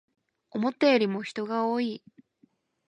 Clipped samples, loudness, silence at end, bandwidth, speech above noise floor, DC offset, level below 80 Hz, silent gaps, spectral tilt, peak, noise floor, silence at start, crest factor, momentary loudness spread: under 0.1%; -27 LUFS; 0.95 s; 10 kHz; 40 dB; under 0.1%; -78 dBFS; none; -6 dB/octave; -10 dBFS; -67 dBFS; 0.55 s; 20 dB; 12 LU